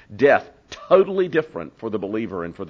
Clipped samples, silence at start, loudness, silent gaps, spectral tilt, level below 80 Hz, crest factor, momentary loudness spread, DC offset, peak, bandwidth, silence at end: under 0.1%; 0.1 s; -20 LUFS; none; -7 dB/octave; -58 dBFS; 18 dB; 15 LU; under 0.1%; -2 dBFS; 7 kHz; 0 s